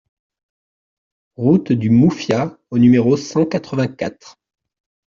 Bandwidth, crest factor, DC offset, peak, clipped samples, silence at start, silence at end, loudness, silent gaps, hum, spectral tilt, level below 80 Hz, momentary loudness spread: 7.4 kHz; 16 dB; under 0.1%; -2 dBFS; under 0.1%; 1.4 s; 0.85 s; -16 LUFS; none; none; -7.5 dB/octave; -54 dBFS; 9 LU